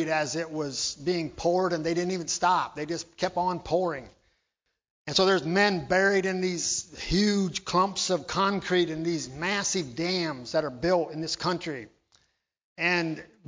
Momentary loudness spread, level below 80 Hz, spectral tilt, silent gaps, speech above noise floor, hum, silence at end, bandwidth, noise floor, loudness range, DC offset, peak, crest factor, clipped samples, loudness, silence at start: 8 LU; -54 dBFS; -3.5 dB/octave; 4.91-5.05 s, 12.64-12.76 s; 54 dB; none; 0.25 s; 7.8 kHz; -81 dBFS; 4 LU; under 0.1%; -8 dBFS; 20 dB; under 0.1%; -27 LUFS; 0 s